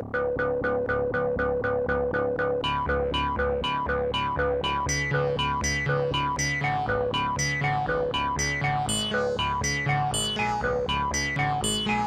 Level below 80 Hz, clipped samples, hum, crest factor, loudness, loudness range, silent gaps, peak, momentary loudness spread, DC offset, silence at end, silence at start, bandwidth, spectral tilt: -40 dBFS; under 0.1%; none; 14 dB; -26 LUFS; 1 LU; none; -12 dBFS; 2 LU; under 0.1%; 0 s; 0 s; 16 kHz; -3.5 dB/octave